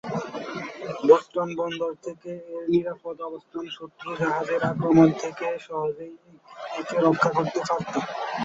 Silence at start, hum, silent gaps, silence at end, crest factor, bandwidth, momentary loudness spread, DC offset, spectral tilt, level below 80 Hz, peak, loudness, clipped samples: 0.05 s; none; none; 0 s; 22 dB; 7.8 kHz; 17 LU; under 0.1%; -6.5 dB/octave; -64 dBFS; -4 dBFS; -25 LUFS; under 0.1%